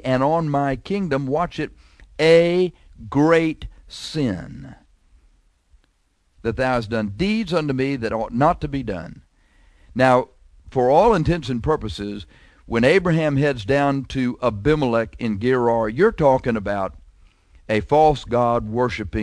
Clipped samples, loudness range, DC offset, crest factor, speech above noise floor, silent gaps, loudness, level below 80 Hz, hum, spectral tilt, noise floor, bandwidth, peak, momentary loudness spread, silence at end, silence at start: under 0.1%; 5 LU; under 0.1%; 18 dB; 45 dB; none; -20 LUFS; -40 dBFS; none; -7 dB/octave; -64 dBFS; 11 kHz; -4 dBFS; 14 LU; 0 s; 0.05 s